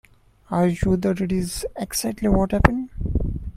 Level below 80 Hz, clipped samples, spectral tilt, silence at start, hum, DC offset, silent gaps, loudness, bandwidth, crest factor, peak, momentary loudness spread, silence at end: -30 dBFS; under 0.1%; -6 dB/octave; 0.5 s; none; under 0.1%; none; -23 LUFS; 15.5 kHz; 22 dB; 0 dBFS; 8 LU; 0.05 s